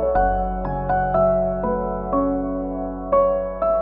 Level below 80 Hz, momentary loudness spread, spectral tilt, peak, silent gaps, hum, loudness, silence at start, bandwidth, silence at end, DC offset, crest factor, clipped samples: -32 dBFS; 7 LU; -12 dB/octave; -8 dBFS; none; none; -21 LUFS; 0 s; 3.6 kHz; 0 s; under 0.1%; 14 dB; under 0.1%